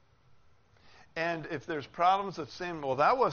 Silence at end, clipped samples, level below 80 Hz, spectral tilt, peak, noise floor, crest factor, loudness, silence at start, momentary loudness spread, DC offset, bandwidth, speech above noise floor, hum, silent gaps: 0 s; under 0.1%; -66 dBFS; -3 dB/octave; -12 dBFS; -61 dBFS; 20 dB; -31 LUFS; 0.85 s; 12 LU; under 0.1%; 6.8 kHz; 31 dB; none; none